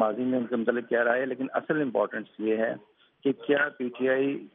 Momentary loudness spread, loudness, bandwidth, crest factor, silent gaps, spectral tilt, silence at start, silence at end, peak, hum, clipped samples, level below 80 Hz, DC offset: 6 LU; -28 LUFS; 3.9 kHz; 20 dB; none; -4 dB/octave; 0 s; 0.05 s; -8 dBFS; none; under 0.1%; -82 dBFS; under 0.1%